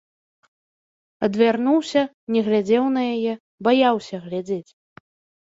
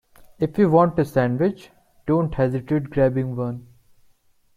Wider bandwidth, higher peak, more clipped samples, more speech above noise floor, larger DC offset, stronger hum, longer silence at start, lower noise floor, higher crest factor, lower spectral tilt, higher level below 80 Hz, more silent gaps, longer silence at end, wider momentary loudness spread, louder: second, 7.8 kHz vs 15 kHz; about the same, -4 dBFS vs -4 dBFS; neither; first, over 70 dB vs 39 dB; neither; neither; first, 1.2 s vs 0.4 s; first, under -90 dBFS vs -59 dBFS; about the same, 18 dB vs 18 dB; second, -6 dB/octave vs -9.5 dB/octave; second, -66 dBFS vs -48 dBFS; first, 2.14-2.27 s, 3.40-3.58 s vs none; about the same, 0.9 s vs 0.95 s; about the same, 11 LU vs 12 LU; about the same, -21 LUFS vs -21 LUFS